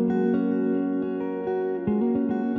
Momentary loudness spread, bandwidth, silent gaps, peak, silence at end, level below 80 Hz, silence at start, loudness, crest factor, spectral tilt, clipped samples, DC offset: 5 LU; 3.9 kHz; none; -12 dBFS; 0 s; -60 dBFS; 0 s; -25 LUFS; 12 dB; -8.5 dB/octave; under 0.1%; under 0.1%